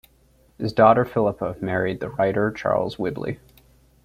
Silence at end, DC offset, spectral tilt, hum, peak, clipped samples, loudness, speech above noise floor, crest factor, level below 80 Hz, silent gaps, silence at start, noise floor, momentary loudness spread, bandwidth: 0.7 s; under 0.1%; -8 dB/octave; none; -2 dBFS; under 0.1%; -22 LUFS; 36 dB; 20 dB; -52 dBFS; none; 0.6 s; -58 dBFS; 15 LU; 15 kHz